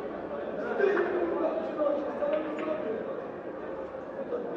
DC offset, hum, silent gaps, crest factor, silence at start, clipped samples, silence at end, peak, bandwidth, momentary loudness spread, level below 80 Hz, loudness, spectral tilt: under 0.1%; none; none; 16 dB; 0 s; under 0.1%; 0 s; -14 dBFS; 7.4 kHz; 11 LU; -66 dBFS; -32 LUFS; -7.5 dB/octave